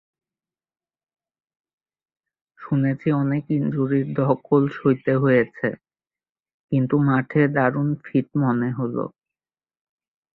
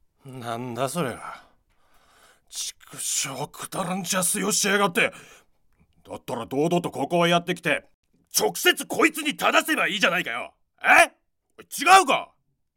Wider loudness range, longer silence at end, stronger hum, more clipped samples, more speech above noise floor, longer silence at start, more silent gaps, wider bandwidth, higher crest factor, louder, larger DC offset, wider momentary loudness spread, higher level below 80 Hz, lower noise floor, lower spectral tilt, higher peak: second, 5 LU vs 10 LU; first, 1.25 s vs 0.5 s; neither; neither; first, over 69 dB vs 39 dB; first, 2.6 s vs 0.25 s; first, 6.29-6.35 s, 6.54-6.68 s vs 7.94-8.03 s; second, 4.2 kHz vs 17 kHz; about the same, 18 dB vs 20 dB; about the same, -22 LUFS vs -22 LUFS; neither; second, 7 LU vs 18 LU; about the same, -62 dBFS vs -66 dBFS; first, under -90 dBFS vs -62 dBFS; first, -11.5 dB/octave vs -2.5 dB/octave; about the same, -6 dBFS vs -4 dBFS